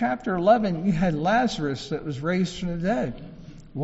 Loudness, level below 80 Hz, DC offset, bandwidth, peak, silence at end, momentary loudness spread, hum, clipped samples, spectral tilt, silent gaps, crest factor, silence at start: -24 LUFS; -44 dBFS; under 0.1%; 8 kHz; -6 dBFS; 0 s; 12 LU; none; under 0.1%; -5.5 dB/octave; none; 18 dB; 0 s